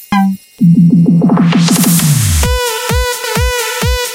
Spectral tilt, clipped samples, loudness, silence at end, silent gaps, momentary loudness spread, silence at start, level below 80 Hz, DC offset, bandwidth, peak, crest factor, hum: -5 dB/octave; under 0.1%; -10 LUFS; 0 s; none; 6 LU; 0 s; -22 dBFS; under 0.1%; 17 kHz; 0 dBFS; 10 dB; none